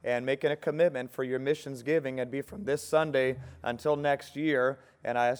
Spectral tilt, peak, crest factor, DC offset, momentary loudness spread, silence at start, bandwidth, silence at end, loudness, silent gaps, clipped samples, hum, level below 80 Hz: -5.5 dB/octave; -12 dBFS; 18 dB; under 0.1%; 7 LU; 0.05 s; over 20 kHz; 0 s; -30 LUFS; none; under 0.1%; none; -64 dBFS